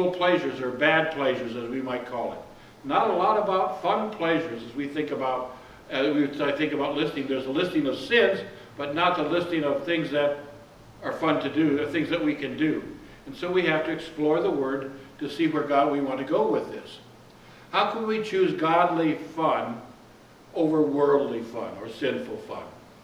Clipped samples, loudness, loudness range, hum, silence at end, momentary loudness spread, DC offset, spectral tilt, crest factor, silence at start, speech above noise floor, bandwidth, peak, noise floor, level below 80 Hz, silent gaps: under 0.1%; -26 LUFS; 2 LU; none; 0.1 s; 14 LU; under 0.1%; -6 dB/octave; 18 dB; 0 s; 26 dB; 13 kHz; -8 dBFS; -51 dBFS; -62 dBFS; none